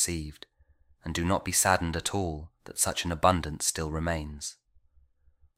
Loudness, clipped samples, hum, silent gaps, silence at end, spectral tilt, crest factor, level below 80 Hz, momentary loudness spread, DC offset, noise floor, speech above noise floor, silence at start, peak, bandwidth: -28 LUFS; under 0.1%; none; none; 1.05 s; -3.5 dB/octave; 24 dB; -46 dBFS; 15 LU; under 0.1%; -63 dBFS; 34 dB; 0 s; -6 dBFS; 16 kHz